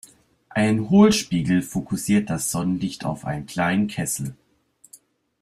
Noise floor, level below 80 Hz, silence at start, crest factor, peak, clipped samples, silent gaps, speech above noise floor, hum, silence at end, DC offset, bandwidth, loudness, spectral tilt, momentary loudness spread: -58 dBFS; -52 dBFS; 0.5 s; 18 dB; -4 dBFS; under 0.1%; none; 37 dB; none; 1.1 s; under 0.1%; 15 kHz; -22 LUFS; -5 dB/octave; 13 LU